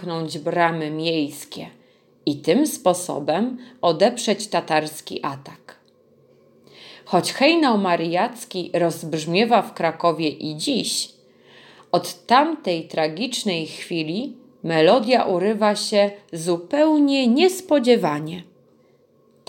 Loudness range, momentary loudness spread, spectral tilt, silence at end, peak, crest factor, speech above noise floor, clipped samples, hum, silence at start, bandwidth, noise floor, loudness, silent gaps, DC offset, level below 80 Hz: 5 LU; 12 LU; -4.5 dB/octave; 1.05 s; -4 dBFS; 18 dB; 37 dB; under 0.1%; none; 0 s; 17 kHz; -57 dBFS; -21 LUFS; none; under 0.1%; -76 dBFS